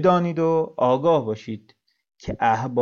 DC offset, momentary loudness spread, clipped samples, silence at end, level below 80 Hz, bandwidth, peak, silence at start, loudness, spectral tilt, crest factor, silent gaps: under 0.1%; 16 LU; under 0.1%; 0 s; -54 dBFS; 7 kHz; -6 dBFS; 0 s; -21 LUFS; -7.5 dB/octave; 16 dB; none